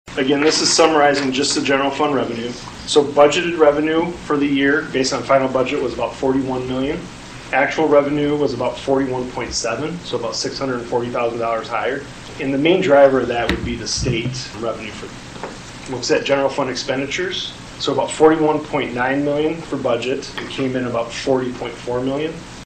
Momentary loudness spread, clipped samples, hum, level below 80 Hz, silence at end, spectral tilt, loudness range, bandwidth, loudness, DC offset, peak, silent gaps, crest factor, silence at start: 13 LU; under 0.1%; none; -42 dBFS; 0 s; -4 dB/octave; 6 LU; 9.6 kHz; -18 LUFS; under 0.1%; 0 dBFS; none; 18 dB; 0.05 s